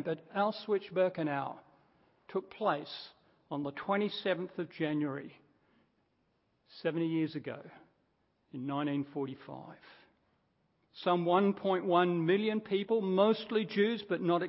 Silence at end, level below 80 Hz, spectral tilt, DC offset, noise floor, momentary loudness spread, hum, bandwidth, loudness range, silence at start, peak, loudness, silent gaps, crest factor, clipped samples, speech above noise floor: 0 s; -80 dBFS; -4.5 dB/octave; under 0.1%; -76 dBFS; 16 LU; none; 5.6 kHz; 10 LU; 0 s; -14 dBFS; -33 LUFS; none; 20 dB; under 0.1%; 43 dB